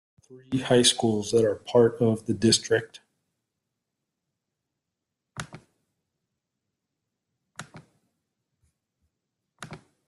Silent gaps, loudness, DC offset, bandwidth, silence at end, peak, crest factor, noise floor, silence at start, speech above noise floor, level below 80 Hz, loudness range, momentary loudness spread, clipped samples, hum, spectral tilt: none; -23 LUFS; under 0.1%; 12.5 kHz; 0.3 s; -6 dBFS; 22 dB; -85 dBFS; 0.3 s; 62 dB; -64 dBFS; 26 LU; 24 LU; under 0.1%; none; -4 dB/octave